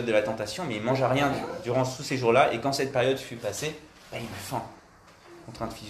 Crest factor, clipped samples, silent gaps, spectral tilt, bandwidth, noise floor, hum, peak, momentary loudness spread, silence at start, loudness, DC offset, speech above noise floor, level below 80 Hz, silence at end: 22 dB; under 0.1%; none; -5 dB/octave; 14 kHz; -53 dBFS; none; -6 dBFS; 15 LU; 0 s; -27 LUFS; under 0.1%; 26 dB; -58 dBFS; 0 s